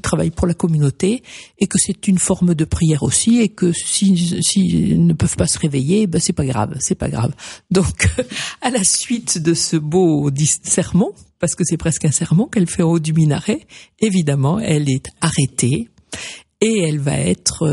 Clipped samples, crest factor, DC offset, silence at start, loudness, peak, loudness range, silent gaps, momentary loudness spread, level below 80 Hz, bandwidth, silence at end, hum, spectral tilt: under 0.1%; 16 dB; under 0.1%; 0.05 s; -17 LUFS; 0 dBFS; 3 LU; none; 7 LU; -38 dBFS; 11.5 kHz; 0 s; none; -5 dB/octave